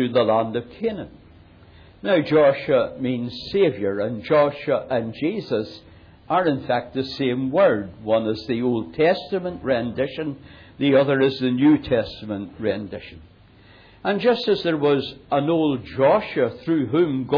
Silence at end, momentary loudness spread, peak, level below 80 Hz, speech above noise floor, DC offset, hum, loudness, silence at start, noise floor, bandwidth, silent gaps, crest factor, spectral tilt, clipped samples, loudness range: 0 s; 10 LU; -8 dBFS; -54 dBFS; 29 dB; under 0.1%; none; -22 LUFS; 0 s; -50 dBFS; 5.4 kHz; none; 14 dB; -8.5 dB/octave; under 0.1%; 3 LU